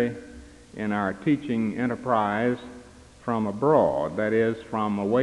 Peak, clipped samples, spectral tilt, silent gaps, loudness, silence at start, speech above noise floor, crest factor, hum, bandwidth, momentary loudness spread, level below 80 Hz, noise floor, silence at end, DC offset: -6 dBFS; under 0.1%; -7.5 dB/octave; none; -25 LUFS; 0 s; 23 dB; 18 dB; none; 11 kHz; 14 LU; -56 dBFS; -48 dBFS; 0 s; under 0.1%